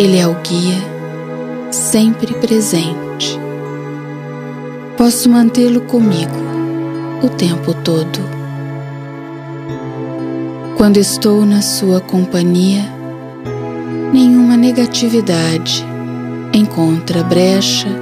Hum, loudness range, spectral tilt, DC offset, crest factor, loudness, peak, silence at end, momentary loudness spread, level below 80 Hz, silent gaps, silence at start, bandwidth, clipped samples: none; 6 LU; -5 dB/octave; under 0.1%; 14 dB; -13 LUFS; 0 dBFS; 0 s; 15 LU; -50 dBFS; none; 0 s; 15.5 kHz; under 0.1%